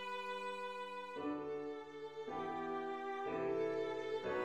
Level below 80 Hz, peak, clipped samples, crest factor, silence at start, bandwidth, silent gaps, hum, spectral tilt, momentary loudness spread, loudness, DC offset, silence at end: -76 dBFS; -28 dBFS; under 0.1%; 14 dB; 0 s; 10.5 kHz; none; none; -5.5 dB/octave; 7 LU; -43 LUFS; under 0.1%; 0 s